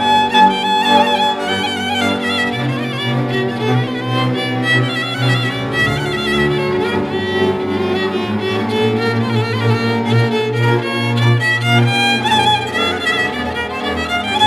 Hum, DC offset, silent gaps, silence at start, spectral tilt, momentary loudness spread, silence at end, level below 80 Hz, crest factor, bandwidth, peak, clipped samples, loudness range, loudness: none; under 0.1%; none; 0 s; -5.5 dB/octave; 6 LU; 0 s; -44 dBFS; 16 dB; 14 kHz; 0 dBFS; under 0.1%; 3 LU; -15 LUFS